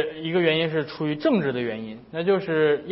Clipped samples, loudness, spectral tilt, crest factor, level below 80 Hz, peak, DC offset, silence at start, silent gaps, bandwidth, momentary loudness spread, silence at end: under 0.1%; -24 LUFS; -10.5 dB/octave; 16 dB; -64 dBFS; -6 dBFS; under 0.1%; 0 s; none; 5.8 kHz; 8 LU; 0 s